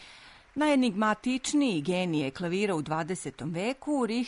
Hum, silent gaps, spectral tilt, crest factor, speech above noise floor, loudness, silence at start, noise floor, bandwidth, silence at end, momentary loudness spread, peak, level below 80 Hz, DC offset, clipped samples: none; none; -5 dB/octave; 14 dB; 24 dB; -29 LUFS; 0 s; -52 dBFS; 11 kHz; 0 s; 10 LU; -14 dBFS; -62 dBFS; under 0.1%; under 0.1%